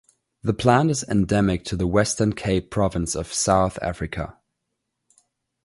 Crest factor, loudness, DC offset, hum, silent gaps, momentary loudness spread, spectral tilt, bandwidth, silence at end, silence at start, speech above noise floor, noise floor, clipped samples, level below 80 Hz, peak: 22 dB; -22 LUFS; under 0.1%; none; none; 11 LU; -5 dB/octave; 11.5 kHz; 1.35 s; 0.45 s; 57 dB; -79 dBFS; under 0.1%; -40 dBFS; -2 dBFS